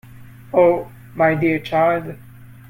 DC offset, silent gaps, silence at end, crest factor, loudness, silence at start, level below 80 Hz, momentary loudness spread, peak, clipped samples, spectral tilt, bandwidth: under 0.1%; none; 0.15 s; 18 dB; -18 LUFS; 0.15 s; -52 dBFS; 11 LU; -2 dBFS; under 0.1%; -8 dB/octave; 16.5 kHz